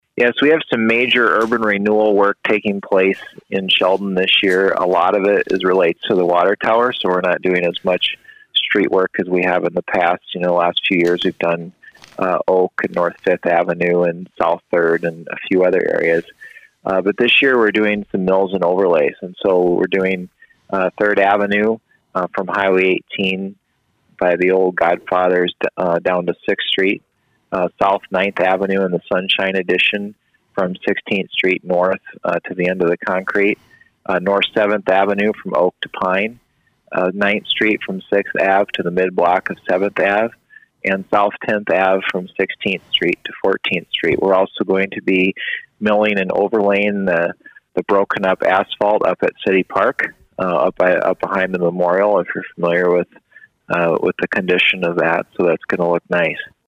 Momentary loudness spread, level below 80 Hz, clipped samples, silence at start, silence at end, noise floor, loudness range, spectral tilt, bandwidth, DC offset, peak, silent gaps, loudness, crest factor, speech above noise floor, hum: 7 LU; -58 dBFS; under 0.1%; 0.15 s; 0.2 s; -64 dBFS; 3 LU; -6.5 dB/octave; 10 kHz; under 0.1%; -2 dBFS; none; -17 LUFS; 14 dB; 48 dB; none